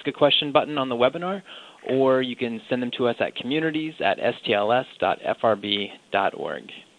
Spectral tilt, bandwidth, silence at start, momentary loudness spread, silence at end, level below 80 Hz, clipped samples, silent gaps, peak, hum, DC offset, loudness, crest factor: -6 dB/octave; 10 kHz; 0 s; 11 LU; 0.15 s; -68 dBFS; under 0.1%; none; -2 dBFS; none; under 0.1%; -24 LUFS; 20 dB